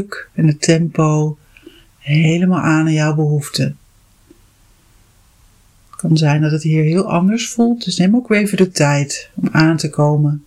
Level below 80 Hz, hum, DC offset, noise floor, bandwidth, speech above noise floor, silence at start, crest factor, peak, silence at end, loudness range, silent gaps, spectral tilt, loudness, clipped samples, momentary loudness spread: -52 dBFS; none; under 0.1%; -51 dBFS; 13 kHz; 36 dB; 0 s; 16 dB; 0 dBFS; 0.05 s; 6 LU; none; -6 dB/octave; -15 LUFS; under 0.1%; 8 LU